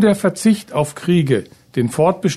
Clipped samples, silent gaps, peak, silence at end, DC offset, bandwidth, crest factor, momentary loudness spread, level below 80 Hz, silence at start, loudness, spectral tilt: under 0.1%; none; -2 dBFS; 0 s; under 0.1%; 13.5 kHz; 14 dB; 6 LU; -54 dBFS; 0 s; -18 LUFS; -6.5 dB/octave